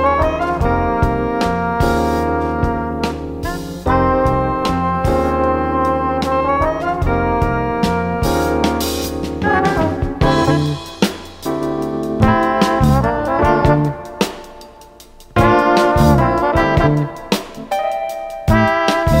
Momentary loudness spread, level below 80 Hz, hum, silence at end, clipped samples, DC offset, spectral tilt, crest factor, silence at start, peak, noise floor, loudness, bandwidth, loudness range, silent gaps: 8 LU; -28 dBFS; none; 0 s; under 0.1%; under 0.1%; -6.5 dB/octave; 16 dB; 0 s; 0 dBFS; -41 dBFS; -16 LUFS; 16.5 kHz; 2 LU; none